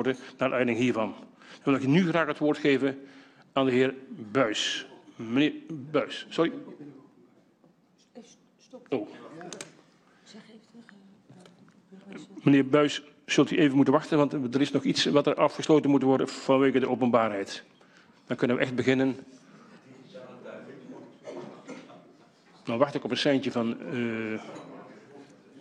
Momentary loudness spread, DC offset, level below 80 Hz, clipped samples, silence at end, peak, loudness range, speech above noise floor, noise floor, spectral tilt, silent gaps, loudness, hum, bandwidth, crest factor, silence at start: 22 LU; under 0.1%; -72 dBFS; under 0.1%; 0 s; -8 dBFS; 17 LU; 37 dB; -63 dBFS; -5.5 dB/octave; none; -26 LUFS; none; 9.6 kHz; 20 dB; 0 s